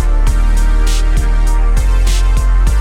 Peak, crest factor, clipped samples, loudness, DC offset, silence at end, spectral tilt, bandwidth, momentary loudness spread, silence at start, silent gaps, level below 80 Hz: -2 dBFS; 8 dB; under 0.1%; -15 LUFS; under 0.1%; 0 s; -5 dB/octave; 12 kHz; 1 LU; 0 s; none; -10 dBFS